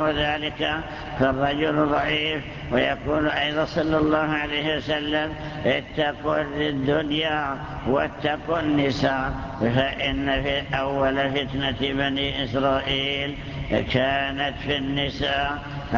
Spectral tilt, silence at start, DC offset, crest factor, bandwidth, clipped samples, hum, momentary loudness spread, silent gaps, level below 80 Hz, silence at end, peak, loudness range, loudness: -6.5 dB/octave; 0 s; under 0.1%; 18 dB; 7.2 kHz; under 0.1%; none; 5 LU; none; -40 dBFS; 0 s; -6 dBFS; 2 LU; -24 LUFS